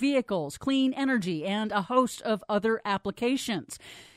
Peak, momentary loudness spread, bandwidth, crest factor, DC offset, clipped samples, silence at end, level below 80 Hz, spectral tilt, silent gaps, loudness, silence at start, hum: -10 dBFS; 6 LU; 14.5 kHz; 18 dB; under 0.1%; under 0.1%; 0.1 s; -64 dBFS; -5 dB/octave; none; -28 LUFS; 0 s; none